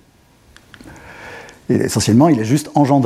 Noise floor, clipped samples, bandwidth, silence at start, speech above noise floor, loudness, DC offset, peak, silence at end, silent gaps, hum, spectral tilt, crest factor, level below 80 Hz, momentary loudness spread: -51 dBFS; under 0.1%; 15 kHz; 0.85 s; 37 dB; -15 LUFS; under 0.1%; 0 dBFS; 0 s; none; none; -6 dB/octave; 16 dB; -50 dBFS; 23 LU